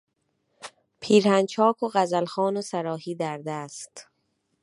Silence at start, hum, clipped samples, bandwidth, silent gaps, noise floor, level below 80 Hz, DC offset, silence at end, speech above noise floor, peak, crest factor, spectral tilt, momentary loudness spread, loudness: 0.6 s; none; under 0.1%; 11.5 kHz; none; -74 dBFS; -76 dBFS; under 0.1%; 0.6 s; 50 dB; -6 dBFS; 20 dB; -5 dB/octave; 23 LU; -24 LUFS